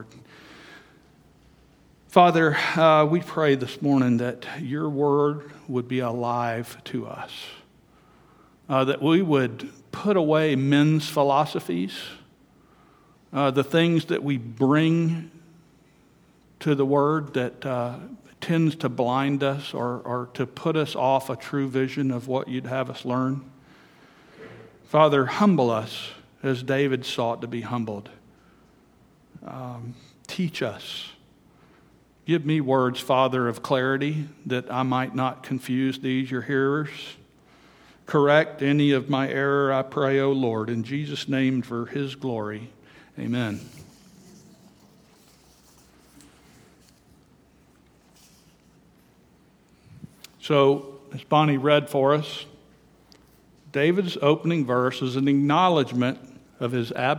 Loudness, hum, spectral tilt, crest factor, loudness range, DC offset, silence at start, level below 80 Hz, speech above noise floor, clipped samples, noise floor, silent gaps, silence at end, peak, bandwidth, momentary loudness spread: -24 LUFS; none; -6.5 dB/octave; 24 dB; 9 LU; under 0.1%; 0 s; -66 dBFS; 35 dB; under 0.1%; -58 dBFS; none; 0 s; -2 dBFS; 18.5 kHz; 16 LU